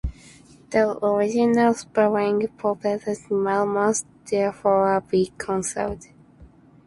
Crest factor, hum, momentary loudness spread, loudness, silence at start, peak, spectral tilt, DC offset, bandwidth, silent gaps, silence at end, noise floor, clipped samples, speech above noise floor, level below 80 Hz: 16 dB; none; 8 LU; -22 LUFS; 0.05 s; -6 dBFS; -5 dB/octave; under 0.1%; 11.5 kHz; none; 0.4 s; -50 dBFS; under 0.1%; 28 dB; -46 dBFS